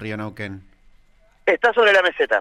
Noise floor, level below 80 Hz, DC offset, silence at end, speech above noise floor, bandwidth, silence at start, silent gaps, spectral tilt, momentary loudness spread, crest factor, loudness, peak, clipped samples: -54 dBFS; -56 dBFS; under 0.1%; 0 s; 36 dB; 12 kHz; 0 s; none; -4.5 dB/octave; 18 LU; 14 dB; -18 LUFS; -6 dBFS; under 0.1%